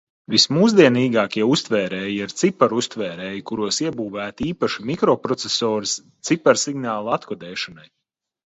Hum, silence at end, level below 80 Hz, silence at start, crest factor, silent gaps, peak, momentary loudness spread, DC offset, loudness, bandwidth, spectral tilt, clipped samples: none; 0.7 s; -60 dBFS; 0.3 s; 20 dB; none; 0 dBFS; 13 LU; under 0.1%; -20 LUFS; 8.2 kHz; -4 dB/octave; under 0.1%